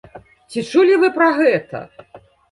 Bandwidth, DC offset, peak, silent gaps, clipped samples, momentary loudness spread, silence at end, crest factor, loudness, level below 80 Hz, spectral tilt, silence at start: 11.5 kHz; under 0.1%; -2 dBFS; none; under 0.1%; 17 LU; 0.35 s; 16 dB; -15 LUFS; -60 dBFS; -5.5 dB/octave; 0.15 s